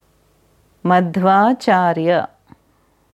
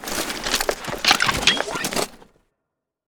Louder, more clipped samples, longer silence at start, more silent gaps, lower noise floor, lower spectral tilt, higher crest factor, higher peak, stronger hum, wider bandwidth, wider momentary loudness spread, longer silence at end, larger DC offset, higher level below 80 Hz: first, -16 LUFS vs -20 LUFS; neither; first, 0.85 s vs 0 s; neither; second, -58 dBFS vs -81 dBFS; first, -7 dB/octave vs -1 dB/octave; second, 16 dB vs 24 dB; about the same, 0 dBFS vs 0 dBFS; neither; second, 11.5 kHz vs over 20 kHz; about the same, 8 LU vs 9 LU; about the same, 0.9 s vs 0.85 s; neither; second, -62 dBFS vs -44 dBFS